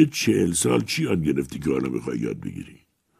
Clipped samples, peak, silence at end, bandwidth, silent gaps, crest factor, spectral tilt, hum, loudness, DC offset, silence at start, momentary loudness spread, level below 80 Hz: under 0.1%; -4 dBFS; 0.45 s; 15.5 kHz; none; 20 dB; -5 dB/octave; none; -24 LUFS; under 0.1%; 0 s; 14 LU; -50 dBFS